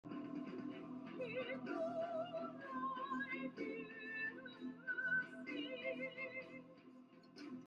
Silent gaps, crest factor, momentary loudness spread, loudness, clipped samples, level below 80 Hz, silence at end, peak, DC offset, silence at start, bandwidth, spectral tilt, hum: none; 16 dB; 13 LU; -45 LUFS; under 0.1%; -88 dBFS; 0 s; -30 dBFS; under 0.1%; 0.05 s; 9.4 kHz; -6 dB/octave; none